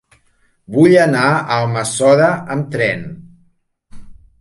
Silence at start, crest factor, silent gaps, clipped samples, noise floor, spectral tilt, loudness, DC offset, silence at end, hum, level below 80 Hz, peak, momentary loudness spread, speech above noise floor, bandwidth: 0.7 s; 16 dB; none; under 0.1%; -58 dBFS; -5.5 dB/octave; -14 LUFS; under 0.1%; 0.3 s; none; -50 dBFS; 0 dBFS; 11 LU; 44 dB; 11.5 kHz